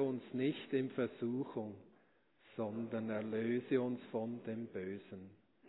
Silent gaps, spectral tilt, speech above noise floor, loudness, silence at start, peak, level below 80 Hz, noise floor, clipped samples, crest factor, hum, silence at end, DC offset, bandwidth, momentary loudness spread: none; -5.5 dB/octave; 32 dB; -40 LUFS; 0 s; -22 dBFS; -88 dBFS; -72 dBFS; under 0.1%; 18 dB; none; 0 s; under 0.1%; 3.9 kHz; 13 LU